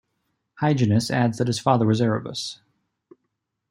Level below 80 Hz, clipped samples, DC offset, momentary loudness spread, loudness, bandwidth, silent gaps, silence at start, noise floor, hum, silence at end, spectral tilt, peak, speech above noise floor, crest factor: -62 dBFS; under 0.1%; under 0.1%; 10 LU; -22 LUFS; 15 kHz; none; 0.6 s; -78 dBFS; none; 1.15 s; -6 dB/octave; -4 dBFS; 57 dB; 20 dB